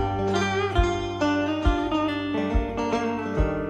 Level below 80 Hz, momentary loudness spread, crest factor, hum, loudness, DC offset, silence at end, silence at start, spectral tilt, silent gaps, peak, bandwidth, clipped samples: -30 dBFS; 3 LU; 16 dB; none; -25 LUFS; under 0.1%; 0 s; 0 s; -6 dB/octave; none; -8 dBFS; 9.2 kHz; under 0.1%